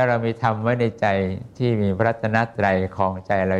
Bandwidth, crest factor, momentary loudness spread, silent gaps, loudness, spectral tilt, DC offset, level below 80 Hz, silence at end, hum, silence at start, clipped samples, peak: 8.2 kHz; 18 dB; 4 LU; none; -22 LUFS; -8 dB/octave; under 0.1%; -54 dBFS; 0 s; none; 0 s; under 0.1%; -4 dBFS